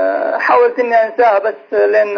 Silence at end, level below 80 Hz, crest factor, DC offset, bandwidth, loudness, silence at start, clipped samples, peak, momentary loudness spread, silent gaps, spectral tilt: 0 s; -64 dBFS; 12 dB; under 0.1%; 5.4 kHz; -13 LUFS; 0 s; under 0.1%; 0 dBFS; 4 LU; none; -4.5 dB/octave